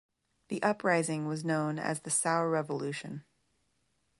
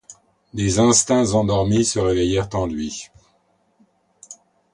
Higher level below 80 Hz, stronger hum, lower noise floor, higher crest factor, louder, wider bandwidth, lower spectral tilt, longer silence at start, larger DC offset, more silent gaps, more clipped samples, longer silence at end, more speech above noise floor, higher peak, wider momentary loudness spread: second, -78 dBFS vs -40 dBFS; neither; first, -77 dBFS vs -63 dBFS; about the same, 20 dB vs 18 dB; second, -31 LUFS vs -19 LUFS; about the same, 11.5 kHz vs 11.5 kHz; about the same, -4.5 dB/octave vs -4.5 dB/octave; first, 0.5 s vs 0.1 s; neither; neither; neither; first, 1 s vs 0.4 s; about the same, 45 dB vs 45 dB; second, -14 dBFS vs -2 dBFS; about the same, 12 LU vs 14 LU